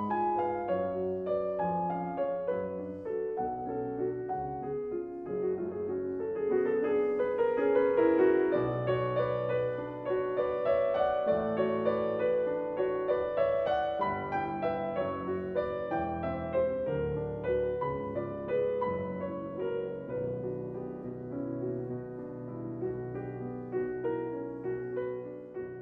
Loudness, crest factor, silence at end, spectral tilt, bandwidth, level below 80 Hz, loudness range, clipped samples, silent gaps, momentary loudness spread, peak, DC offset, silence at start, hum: -32 LUFS; 16 dB; 0 s; -10 dB/octave; 5.2 kHz; -58 dBFS; 8 LU; under 0.1%; none; 9 LU; -14 dBFS; under 0.1%; 0 s; none